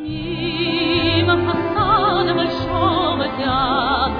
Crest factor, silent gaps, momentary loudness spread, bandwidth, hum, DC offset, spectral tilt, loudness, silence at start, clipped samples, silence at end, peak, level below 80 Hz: 14 dB; none; 5 LU; 5.2 kHz; none; under 0.1%; -8 dB/octave; -18 LUFS; 0 s; under 0.1%; 0 s; -4 dBFS; -36 dBFS